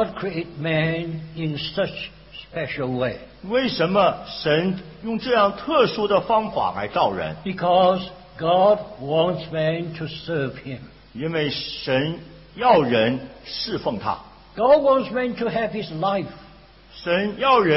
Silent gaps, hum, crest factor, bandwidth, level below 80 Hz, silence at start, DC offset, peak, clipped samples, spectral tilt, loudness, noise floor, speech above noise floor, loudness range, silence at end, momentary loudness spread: none; none; 20 dB; 5.8 kHz; -52 dBFS; 0 s; under 0.1%; -2 dBFS; under 0.1%; -9.5 dB/octave; -22 LUFS; -48 dBFS; 26 dB; 5 LU; 0 s; 14 LU